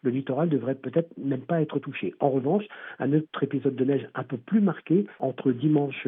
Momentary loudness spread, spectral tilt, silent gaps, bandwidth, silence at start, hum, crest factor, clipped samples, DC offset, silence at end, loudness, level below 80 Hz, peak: 7 LU; -7.5 dB/octave; none; 3.9 kHz; 0.05 s; none; 18 dB; under 0.1%; under 0.1%; 0 s; -27 LUFS; -88 dBFS; -8 dBFS